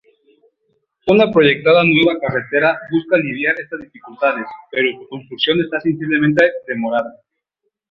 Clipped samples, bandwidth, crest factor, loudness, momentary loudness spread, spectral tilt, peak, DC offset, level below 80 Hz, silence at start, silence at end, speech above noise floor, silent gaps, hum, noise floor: under 0.1%; 7 kHz; 16 dB; -16 LUFS; 14 LU; -7.5 dB/octave; 0 dBFS; under 0.1%; -56 dBFS; 1.05 s; 0.8 s; 57 dB; none; none; -74 dBFS